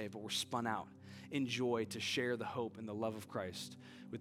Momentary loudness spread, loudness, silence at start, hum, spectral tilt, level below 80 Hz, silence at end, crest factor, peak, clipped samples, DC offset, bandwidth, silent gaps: 13 LU; -40 LUFS; 0 s; none; -4 dB/octave; -84 dBFS; 0 s; 18 dB; -22 dBFS; under 0.1%; under 0.1%; 17 kHz; none